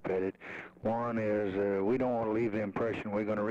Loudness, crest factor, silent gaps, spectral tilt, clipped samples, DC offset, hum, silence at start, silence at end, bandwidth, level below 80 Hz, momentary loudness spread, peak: -33 LUFS; 10 dB; none; -8.5 dB/octave; under 0.1%; under 0.1%; none; 0 s; 0 s; 8 kHz; -64 dBFS; 7 LU; -22 dBFS